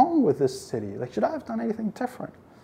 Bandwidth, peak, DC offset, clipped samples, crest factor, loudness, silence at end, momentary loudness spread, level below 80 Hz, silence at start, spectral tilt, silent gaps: 16 kHz; -8 dBFS; under 0.1%; under 0.1%; 18 dB; -27 LUFS; 0.35 s; 11 LU; -64 dBFS; 0 s; -7 dB/octave; none